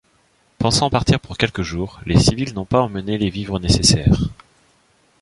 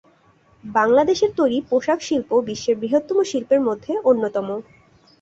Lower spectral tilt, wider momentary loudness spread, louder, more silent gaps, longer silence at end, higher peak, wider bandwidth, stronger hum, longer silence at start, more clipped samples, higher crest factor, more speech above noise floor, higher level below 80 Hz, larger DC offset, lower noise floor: about the same, -5 dB/octave vs -4.5 dB/octave; first, 11 LU vs 7 LU; about the same, -18 LUFS vs -20 LUFS; neither; first, 0.9 s vs 0.6 s; about the same, -2 dBFS vs -4 dBFS; first, 11.5 kHz vs 8 kHz; neither; about the same, 0.6 s vs 0.65 s; neither; about the same, 18 dB vs 16 dB; first, 41 dB vs 37 dB; first, -32 dBFS vs -60 dBFS; neither; about the same, -59 dBFS vs -56 dBFS